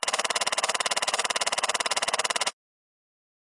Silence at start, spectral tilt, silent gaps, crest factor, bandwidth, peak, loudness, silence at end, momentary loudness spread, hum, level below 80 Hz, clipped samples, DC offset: 0 s; 1.5 dB/octave; none; 20 dB; 11.5 kHz; -8 dBFS; -25 LUFS; 1 s; 1 LU; none; -68 dBFS; under 0.1%; under 0.1%